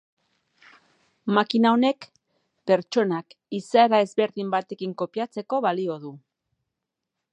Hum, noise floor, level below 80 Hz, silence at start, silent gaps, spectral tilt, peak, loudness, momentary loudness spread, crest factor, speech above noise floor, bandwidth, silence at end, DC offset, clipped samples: none; -84 dBFS; -80 dBFS; 1.25 s; none; -6 dB/octave; -6 dBFS; -24 LUFS; 15 LU; 20 dB; 61 dB; 9 kHz; 1.15 s; under 0.1%; under 0.1%